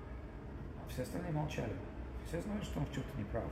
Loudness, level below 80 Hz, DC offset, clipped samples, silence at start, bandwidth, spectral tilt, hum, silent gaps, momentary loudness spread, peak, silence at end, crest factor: -42 LUFS; -50 dBFS; under 0.1%; under 0.1%; 0 s; 16 kHz; -6.5 dB/octave; none; none; 9 LU; -26 dBFS; 0 s; 16 dB